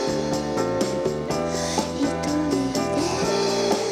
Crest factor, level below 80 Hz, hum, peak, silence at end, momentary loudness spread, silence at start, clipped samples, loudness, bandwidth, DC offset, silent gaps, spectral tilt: 16 dB; -46 dBFS; none; -8 dBFS; 0 s; 3 LU; 0 s; under 0.1%; -24 LUFS; 16 kHz; under 0.1%; none; -4.5 dB/octave